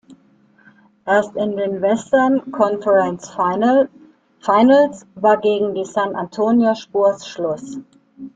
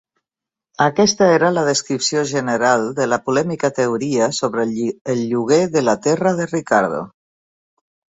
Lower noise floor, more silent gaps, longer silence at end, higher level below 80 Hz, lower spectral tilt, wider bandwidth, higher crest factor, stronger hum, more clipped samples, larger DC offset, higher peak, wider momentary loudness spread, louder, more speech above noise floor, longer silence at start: second, -54 dBFS vs -87 dBFS; second, none vs 5.01-5.05 s; second, 0.05 s vs 1 s; about the same, -62 dBFS vs -58 dBFS; first, -6 dB/octave vs -4.5 dB/octave; about the same, 9 kHz vs 8.4 kHz; about the same, 16 dB vs 16 dB; neither; neither; neither; about the same, -2 dBFS vs -2 dBFS; first, 10 LU vs 7 LU; about the same, -17 LUFS vs -17 LUFS; second, 37 dB vs 70 dB; second, 0.1 s vs 0.8 s